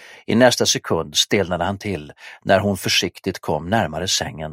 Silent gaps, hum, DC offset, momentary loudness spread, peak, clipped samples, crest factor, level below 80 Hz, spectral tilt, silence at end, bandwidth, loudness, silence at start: none; none; under 0.1%; 12 LU; 0 dBFS; under 0.1%; 20 dB; -48 dBFS; -3.5 dB/octave; 0 s; 16.5 kHz; -19 LUFS; 0 s